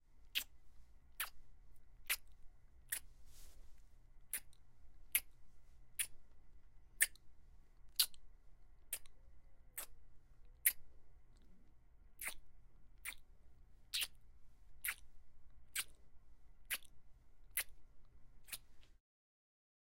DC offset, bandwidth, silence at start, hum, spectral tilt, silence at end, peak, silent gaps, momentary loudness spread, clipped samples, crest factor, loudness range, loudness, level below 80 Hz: under 0.1%; 16 kHz; 0 s; none; 2 dB/octave; 1.05 s; -16 dBFS; none; 15 LU; under 0.1%; 32 dB; 7 LU; -43 LUFS; -64 dBFS